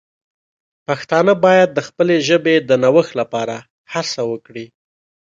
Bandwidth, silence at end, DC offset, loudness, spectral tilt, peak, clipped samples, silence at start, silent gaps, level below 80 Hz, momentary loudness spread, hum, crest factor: 7.6 kHz; 0.65 s; under 0.1%; -16 LUFS; -5 dB/octave; 0 dBFS; under 0.1%; 0.9 s; 3.70-3.85 s; -62 dBFS; 16 LU; none; 16 dB